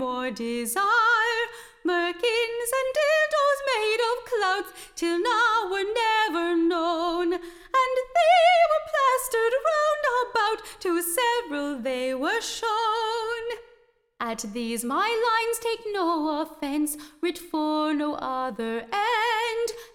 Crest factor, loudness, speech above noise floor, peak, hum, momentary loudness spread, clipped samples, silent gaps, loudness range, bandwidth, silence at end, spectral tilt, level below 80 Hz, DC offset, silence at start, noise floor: 16 dB; -25 LUFS; 34 dB; -10 dBFS; none; 9 LU; under 0.1%; none; 6 LU; 18 kHz; 0.1 s; -2 dB/octave; -60 dBFS; under 0.1%; 0 s; -60 dBFS